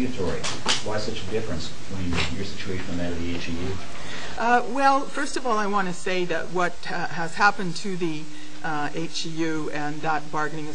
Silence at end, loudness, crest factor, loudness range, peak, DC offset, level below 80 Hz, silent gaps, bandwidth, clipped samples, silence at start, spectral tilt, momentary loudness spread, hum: 0 s; -27 LUFS; 22 dB; 5 LU; -4 dBFS; 6%; -46 dBFS; none; 10.5 kHz; under 0.1%; 0 s; -4 dB/octave; 11 LU; none